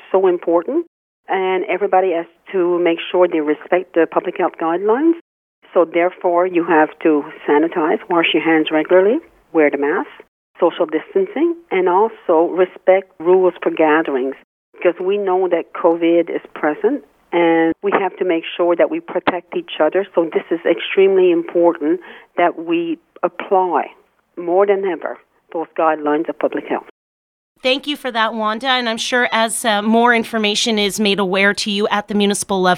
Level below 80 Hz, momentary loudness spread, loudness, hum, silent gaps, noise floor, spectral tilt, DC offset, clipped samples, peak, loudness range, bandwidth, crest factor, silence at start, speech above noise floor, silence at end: -64 dBFS; 8 LU; -17 LUFS; none; 0.87-1.23 s, 5.21-5.62 s, 10.28-10.54 s, 14.44-14.73 s, 26.91-27.55 s; under -90 dBFS; -4 dB/octave; under 0.1%; under 0.1%; 0 dBFS; 4 LU; 15 kHz; 16 dB; 0.1 s; over 74 dB; 0 s